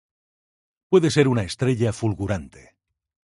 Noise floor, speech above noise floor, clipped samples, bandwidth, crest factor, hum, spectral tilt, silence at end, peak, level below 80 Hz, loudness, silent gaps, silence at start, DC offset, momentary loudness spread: under -90 dBFS; over 69 dB; under 0.1%; 11.5 kHz; 20 dB; none; -6.5 dB/octave; 0.85 s; -4 dBFS; -46 dBFS; -22 LUFS; none; 0.9 s; under 0.1%; 9 LU